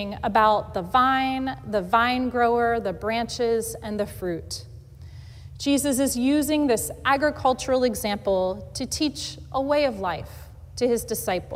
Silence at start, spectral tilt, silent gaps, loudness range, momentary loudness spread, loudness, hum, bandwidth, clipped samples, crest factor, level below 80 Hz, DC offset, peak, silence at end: 0 s; -4 dB/octave; none; 4 LU; 12 LU; -24 LUFS; none; 16 kHz; under 0.1%; 18 dB; -46 dBFS; under 0.1%; -6 dBFS; 0 s